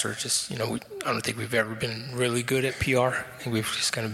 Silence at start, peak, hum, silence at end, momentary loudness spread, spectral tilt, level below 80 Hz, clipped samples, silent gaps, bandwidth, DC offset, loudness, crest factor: 0 s; -10 dBFS; none; 0 s; 7 LU; -3.5 dB/octave; -52 dBFS; under 0.1%; none; 16.5 kHz; under 0.1%; -27 LUFS; 18 dB